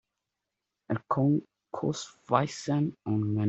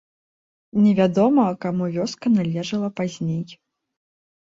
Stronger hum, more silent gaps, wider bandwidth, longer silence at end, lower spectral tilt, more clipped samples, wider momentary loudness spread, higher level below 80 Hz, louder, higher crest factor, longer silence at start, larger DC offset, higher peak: neither; neither; about the same, 8.2 kHz vs 7.6 kHz; second, 0 s vs 0.85 s; about the same, -7 dB/octave vs -7 dB/octave; neither; about the same, 9 LU vs 10 LU; second, -68 dBFS vs -62 dBFS; second, -30 LUFS vs -21 LUFS; first, 24 dB vs 16 dB; first, 0.9 s vs 0.75 s; neither; about the same, -8 dBFS vs -6 dBFS